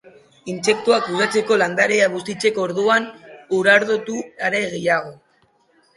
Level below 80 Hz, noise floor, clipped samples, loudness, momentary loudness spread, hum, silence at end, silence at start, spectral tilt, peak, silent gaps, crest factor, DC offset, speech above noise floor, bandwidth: -66 dBFS; -60 dBFS; under 0.1%; -18 LUFS; 10 LU; none; 0.8 s; 0.45 s; -3.5 dB/octave; -2 dBFS; none; 18 dB; under 0.1%; 41 dB; 11.5 kHz